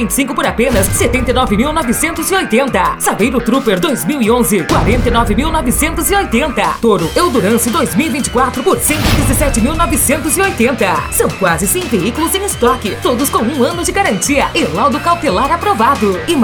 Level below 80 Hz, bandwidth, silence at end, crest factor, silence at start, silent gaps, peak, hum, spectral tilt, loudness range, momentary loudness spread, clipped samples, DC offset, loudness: -24 dBFS; over 20 kHz; 0 s; 12 dB; 0 s; none; 0 dBFS; none; -4 dB/octave; 1 LU; 3 LU; under 0.1%; under 0.1%; -12 LUFS